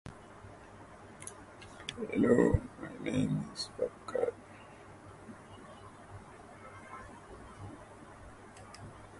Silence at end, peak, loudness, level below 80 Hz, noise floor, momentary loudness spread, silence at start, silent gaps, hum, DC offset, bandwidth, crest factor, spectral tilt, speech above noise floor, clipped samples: 0 s; -12 dBFS; -34 LUFS; -54 dBFS; -53 dBFS; 22 LU; 0.05 s; none; none; under 0.1%; 11.5 kHz; 26 dB; -6.5 dB/octave; 21 dB; under 0.1%